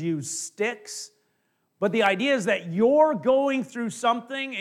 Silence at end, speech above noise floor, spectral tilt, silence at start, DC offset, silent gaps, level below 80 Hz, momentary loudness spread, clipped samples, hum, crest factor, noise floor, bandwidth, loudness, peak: 0 s; 48 dB; -4 dB/octave; 0 s; under 0.1%; none; -76 dBFS; 12 LU; under 0.1%; none; 16 dB; -72 dBFS; 14.5 kHz; -24 LUFS; -8 dBFS